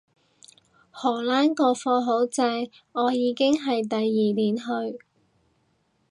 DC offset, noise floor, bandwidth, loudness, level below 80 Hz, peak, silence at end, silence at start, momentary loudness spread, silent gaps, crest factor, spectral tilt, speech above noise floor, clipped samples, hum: under 0.1%; -68 dBFS; 11.5 kHz; -24 LUFS; -76 dBFS; -8 dBFS; 1.15 s; 0.95 s; 8 LU; none; 16 dB; -5 dB/octave; 45 dB; under 0.1%; none